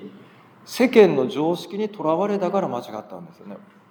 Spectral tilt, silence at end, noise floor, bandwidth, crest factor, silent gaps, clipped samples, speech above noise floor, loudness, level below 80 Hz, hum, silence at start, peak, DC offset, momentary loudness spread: -6 dB/octave; 0.35 s; -48 dBFS; over 20 kHz; 22 dB; none; under 0.1%; 27 dB; -21 LUFS; -76 dBFS; none; 0 s; 0 dBFS; under 0.1%; 25 LU